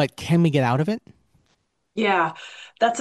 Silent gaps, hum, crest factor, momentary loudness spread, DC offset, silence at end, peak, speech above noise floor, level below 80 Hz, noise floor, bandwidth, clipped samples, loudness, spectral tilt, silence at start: none; none; 16 dB; 16 LU; under 0.1%; 0 s; -6 dBFS; 47 dB; -60 dBFS; -69 dBFS; 12.5 kHz; under 0.1%; -22 LUFS; -6 dB/octave; 0 s